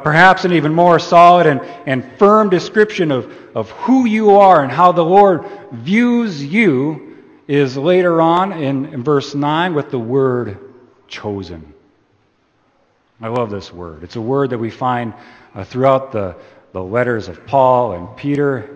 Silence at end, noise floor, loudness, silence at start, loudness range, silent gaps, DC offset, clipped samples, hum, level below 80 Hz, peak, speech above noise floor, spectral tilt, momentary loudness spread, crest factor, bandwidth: 0 s; -59 dBFS; -14 LUFS; 0 s; 12 LU; none; under 0.1%; under 0.1%; none; -54 dBFS; 0 dBFS; 45 dB; -7 dB/octave; 18 LU; 14 dB; 8.6 kHz